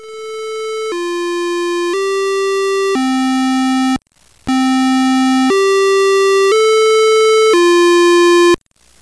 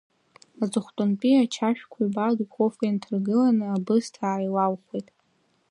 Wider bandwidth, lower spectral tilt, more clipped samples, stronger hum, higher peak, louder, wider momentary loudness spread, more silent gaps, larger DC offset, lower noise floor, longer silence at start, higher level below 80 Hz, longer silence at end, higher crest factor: about the same, 11 kHz vs 11 kHz; second, -2.5 dB/octave vs -6.5 dB/octave; neither; neither; first, -4 dBFS vs -10 dBFS; first, -12 LUFS vs -25 LUFS; first, 11 LU vs 7 LU; neither; first, 0.4% vs under 0.1%; second, -49 dBFS vs -68 dBFS; second, 0 s vs 0.6 s; first, -52 dBFS vs -76 dBFS; second, 0.45 s vs 0.7 s; second, 8 dB vs 16 dB